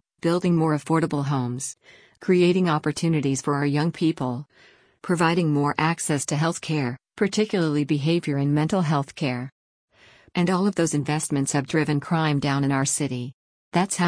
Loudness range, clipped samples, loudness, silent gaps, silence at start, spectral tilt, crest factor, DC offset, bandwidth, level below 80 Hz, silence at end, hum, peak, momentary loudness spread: 2 LU; under 0.1%; -23 LUFS; 9.52-9.88 s, 13.34-13.72 s; 0.25 s; -5.5 dB/octave; 16 dB; under 0.1%; 10.5 kHz; -60 dBFS; 0 s; none; -6 dBFS; 8 LU